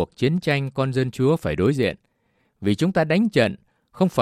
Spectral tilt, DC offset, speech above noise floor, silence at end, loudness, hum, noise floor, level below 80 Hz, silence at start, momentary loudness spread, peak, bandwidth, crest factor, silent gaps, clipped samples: -7 dB/octave; under 0.1%; 46 dB; 0 s; -22 LUFS; none; -67 dBFS; -52 dBFS; 0 s; 6 LU; -4 dBFS; 14.5 kHz; 16 dB; none; under 0.1%